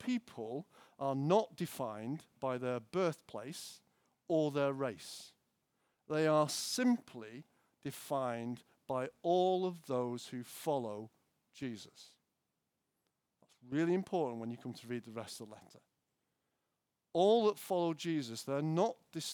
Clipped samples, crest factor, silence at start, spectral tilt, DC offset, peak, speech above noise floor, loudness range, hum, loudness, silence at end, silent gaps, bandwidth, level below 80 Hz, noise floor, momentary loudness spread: under 0.1%; 22 dB; 0 s; -5.5 dB/octave; under 0.1%; -16 dBFS; 50 dB; 7 LU; none; -37 LUFS; 0 s; none; over 20 kHz; -86 dBFS; -87 dBFS; 17 LU